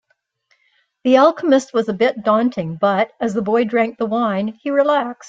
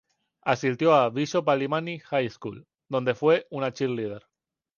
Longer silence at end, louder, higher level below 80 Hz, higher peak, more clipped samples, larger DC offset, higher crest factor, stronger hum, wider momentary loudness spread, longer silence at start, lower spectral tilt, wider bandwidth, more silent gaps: second, 0 s vs 0.6 s; first, -17 LUFS vs -26 LUFS; about the same, -64 dBFS vs -68 dBFS; first, -2 dBFS vs -6 dBFS; neither; neither; about the same, 16 dB vs 20 dB; neither; second, 8 LU vs 12 LU; first, 1.05 s vs 0.45 s; about the same, -6 dB/octave vs -6 dB/octave; about the same, 7.8 kHz vs 7.2 kHz; neither